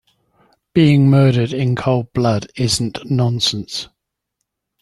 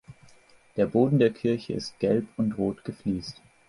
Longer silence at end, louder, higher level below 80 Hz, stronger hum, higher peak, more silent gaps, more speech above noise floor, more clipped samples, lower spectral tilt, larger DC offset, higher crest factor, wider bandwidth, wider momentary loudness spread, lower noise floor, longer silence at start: first, 0.95 s vs 0.35 s; first, -16 LUFS vs -27 LUFS; first, -48 dBFS vs -56 dBFS; neither; first, -2 dBFS vs -8 dBFS; neither; first, 61 dB vs 30 dB; neither; second, -6 dB/octave vs -7.5 dB/octave; neither; about the same, 16 dB vs 18 dB; about the same, 12 kHz vs 11.5 kHz; about the same, 11 LU vs 12 LU; first, -76 dBFS vs -56 dBFS; first, 0.75 s vs 0.1 s